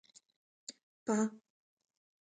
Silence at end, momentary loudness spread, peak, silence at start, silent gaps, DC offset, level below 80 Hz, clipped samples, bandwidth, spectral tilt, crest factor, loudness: 0.95 s; 17 LU; -22 dBFS; 0.7 s; 0.83-1.06 s; under 0.1%; -86 dBFS; under 0.1%; 9.4 kHz; -5 dB/octave; 20 dB; -36 LUFS